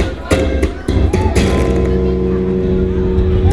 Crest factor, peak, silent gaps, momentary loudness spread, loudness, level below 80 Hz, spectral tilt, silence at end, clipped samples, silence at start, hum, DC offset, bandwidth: 14 dB; 0 dBFS; none; 3 LU; -15 LUFS; -18 dBFS; -7 dB/octave; 0 s; under 0.1%; 0 s; none; 2%; 12 kHz